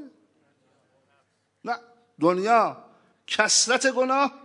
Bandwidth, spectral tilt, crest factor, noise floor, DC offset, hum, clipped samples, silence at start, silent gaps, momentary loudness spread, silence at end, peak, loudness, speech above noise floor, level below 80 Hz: 11 kHz; -1.5 dB/octave; 22 dB; -68 dBFS; under 0.1%; none; under 0.1%; 0 s; none; 15 LU; 0.05 s; -4 dBFS; -22 LUFS; 46 dB; -84 dBFS